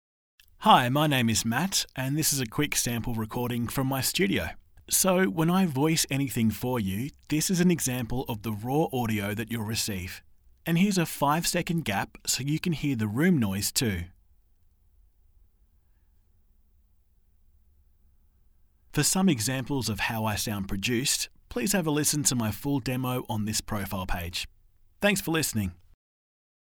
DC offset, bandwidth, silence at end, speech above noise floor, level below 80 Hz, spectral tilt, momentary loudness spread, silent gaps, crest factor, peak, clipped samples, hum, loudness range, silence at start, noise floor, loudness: under 0.1%; over 20 kHz; 1 s; 36 dB; -50 dBFS; -4 dB/octave; 9 LU; none; 24 dB; -4 dBFS; under 0.1%; none; 5 LU; 0.6 s; -63 dBFS; -27 LUFS